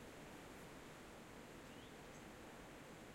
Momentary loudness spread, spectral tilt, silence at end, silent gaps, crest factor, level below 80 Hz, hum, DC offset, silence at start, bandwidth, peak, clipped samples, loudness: 1 LU; -4 dB/octave; 0 s; none; 14 dB; -70 dBFS; none; under 0.1%; 0 s; 16 kHz; -42 dBFS; under 0.1%; -57 LUFS